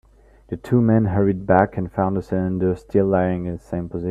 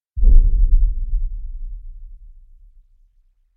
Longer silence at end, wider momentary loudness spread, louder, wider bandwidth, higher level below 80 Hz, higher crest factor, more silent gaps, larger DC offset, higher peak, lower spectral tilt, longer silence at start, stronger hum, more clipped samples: second, 0 s vs 1.4 s; second, 10 LU vs 22 LU; about the same, -20 LUFS vs -21 LUFS; first, 8 kHz vs 0.5 kHz; second, -46 dBFS vs -16 dBFS; about the same, 20 dB vs 16 dB; neither; neither; about the same, 0 dBFS vs 0 dBFS; second, -10.5 dB/octave vs -14.5 dB/octave; first, 0.5 s vs 0.15 s; neither; neither